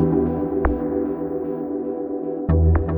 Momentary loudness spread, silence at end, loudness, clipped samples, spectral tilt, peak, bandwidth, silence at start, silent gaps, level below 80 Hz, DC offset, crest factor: 8 LU; 0 s; -23 LUFS; under 0.1%; -13.5 dB/octave; -4 dBFS; 2.8 kHz; 0 s; none; -28 dBFS; under 0.1%; 16 dB